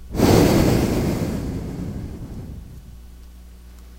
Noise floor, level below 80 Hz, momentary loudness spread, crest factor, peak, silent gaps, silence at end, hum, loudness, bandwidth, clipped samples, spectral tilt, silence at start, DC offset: -41 dBFS; -32 dBFS; 23 LU; 22 dB; 0 dBFS; none; 0 s; 60 Hz at -40 dBFS; -20 LUFS; 16 kHz; under 0.1%; -6 dB/octave; 0 s; under 0.1%